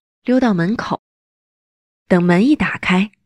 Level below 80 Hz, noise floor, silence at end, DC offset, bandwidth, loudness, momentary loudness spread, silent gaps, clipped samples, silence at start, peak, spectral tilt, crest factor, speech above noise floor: -48 dBFS; under -90 dBFS; 0.15 s; 0.2%; 10.5 kHz; -16 LUFS; 9 LU; 0.99-2.06 s; under 0.1%; 0.25 s; -2 dBFS; -7 dB/octave; 14 dB; over 75 dB